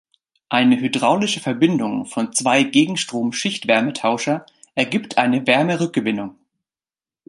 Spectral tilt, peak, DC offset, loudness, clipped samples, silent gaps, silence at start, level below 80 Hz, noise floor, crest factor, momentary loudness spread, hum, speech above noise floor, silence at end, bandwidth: -4 dB/octave; -2 dBFS; under 0.1%; -19 LUFS; under 0.1%; none; 0.5 s; -66 dBFS; under -90 dBFS; 18 dB; 7 LU; none; over 71 dB; 0.95 s; 11.5 kHz